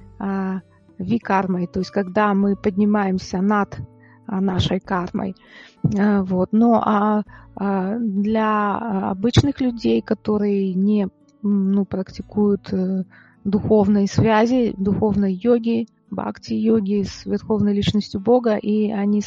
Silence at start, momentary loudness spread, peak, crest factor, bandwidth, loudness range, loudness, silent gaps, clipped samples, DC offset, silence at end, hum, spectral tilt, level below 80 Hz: 0 s; 11 LU; 0 dBFS; 20 dB; 7.4 kHz; 3 LU; -20 LUFS; none; under 0.1%; under 0.1%; 0 s; none; -7.5 dB/octave; -46 dBFS